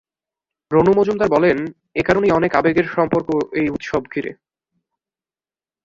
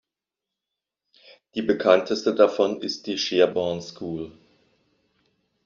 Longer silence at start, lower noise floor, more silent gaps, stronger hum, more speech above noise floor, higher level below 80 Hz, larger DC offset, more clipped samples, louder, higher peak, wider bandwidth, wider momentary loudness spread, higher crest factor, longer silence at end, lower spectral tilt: second, 0.7 s vs 1.55 s; about the same, under -90 dBFS vs -87 dBFS; neither; neither; first, over 73 dB vs 65 dB; first, -48 dBFS vs -66 dBFS; neither; neither; first, -18 LUFS vs -23 LUFS; about the same, -2 dBFS vs -2 dBFS; about the same, 7.6 kHz vs 7.4 kHz; second, 9 LU vs 14 LU; about the same, 18 dB vs 22 dB; first, 1.5 s vs 1.35 s; first, -7.5 dB/octave vs -3 dB/octave